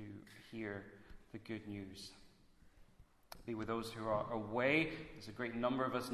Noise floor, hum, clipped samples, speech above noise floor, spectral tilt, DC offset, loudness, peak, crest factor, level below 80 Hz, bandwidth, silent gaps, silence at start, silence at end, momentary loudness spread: -66 dBFS; none; under 0.1%; 25 dB; -5.5 dB/octave; under 0.1%; -41 LUFS; -20 dBFS; 22 dB; -66 dBFS; 13.5 kHz; none; 0 s; 0 s; 20 LU